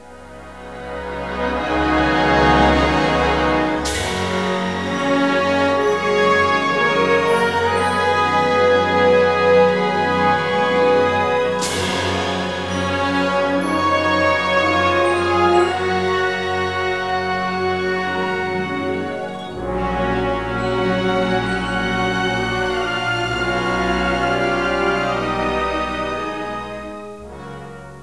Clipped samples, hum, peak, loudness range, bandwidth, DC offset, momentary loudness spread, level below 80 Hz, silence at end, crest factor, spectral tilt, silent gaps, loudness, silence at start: under 0.1%; none; -2 dBFS; 6 LU; 11 kHz; 0.4%; 11 LU; -36 dBFS; 0 s; 16 dB; -5 dB/octave; none; -18 LUFS; 0 s